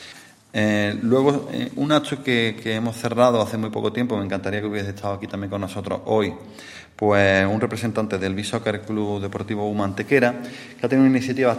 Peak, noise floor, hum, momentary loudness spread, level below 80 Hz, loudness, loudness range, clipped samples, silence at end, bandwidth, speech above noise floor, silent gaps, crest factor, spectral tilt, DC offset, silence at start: -2 dBFS; -45 dBFS; none; 11 LU; -60 dBFS; -22 LUFS; 4 LU; under 0.1%; 0 s; 15 kHz; 23 dB; none; 18 dB; -6 dB/octave; under 0.1%; 0 s